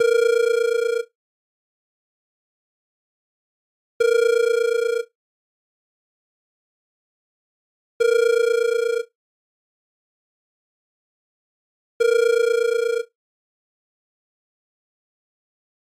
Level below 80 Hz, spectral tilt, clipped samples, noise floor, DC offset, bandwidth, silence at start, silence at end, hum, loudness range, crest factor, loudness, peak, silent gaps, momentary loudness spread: -86 dBFS; 0.5 dB/octave; under 0.1%; under -90 dBFS; under 0.1%; 15.5 kHz; 0 s; 2.95 s; none; 8 LU; 16 dB; -20 LUFS; -10 dBFS; 1.15-4.00 s, 5.15-8.00 s, 9.15-12.00 s; 10 LU